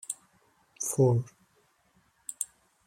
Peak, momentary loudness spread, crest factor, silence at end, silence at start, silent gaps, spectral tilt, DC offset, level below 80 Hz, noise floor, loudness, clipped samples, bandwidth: -12 dBFS; 18 LU; 20 dB; 0.4 s; 0.1 s; none; -6.5 dB/octave; under 0.1%; -68 dBFS; -68 dBFS; -30 LUFS; under 0.1%; 16 kHz